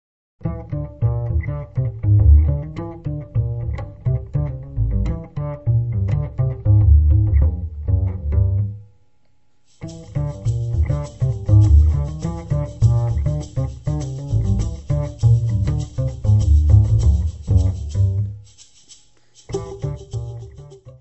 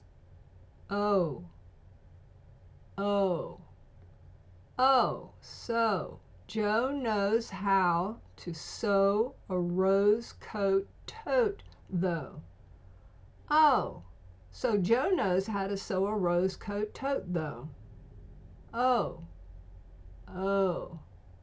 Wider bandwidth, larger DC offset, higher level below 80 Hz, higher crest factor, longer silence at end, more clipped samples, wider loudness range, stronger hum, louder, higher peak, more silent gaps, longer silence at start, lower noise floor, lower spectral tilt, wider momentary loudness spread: about the same, 8.2 kHz vs 8 kHz; first, 0.3% vs under 0.1%; first, -22 dBFS vs -54 dBFS; about the same, 18 dB vs 18 dB; about the same, 0.1 s vs 0.05 s; neither; about the same, 6 LU vs 5 LU; neither; first, -20 LUFS vs -30 LUFS; first, -2 dBFS vs -14 dBFS; neither; first, 0.45 s vs 0.3 s; first, -65 dBFS vs -55 dBFS; first, -9 dB/octave vs -6.5 dB/octave; second, 15 LU vs 18 LU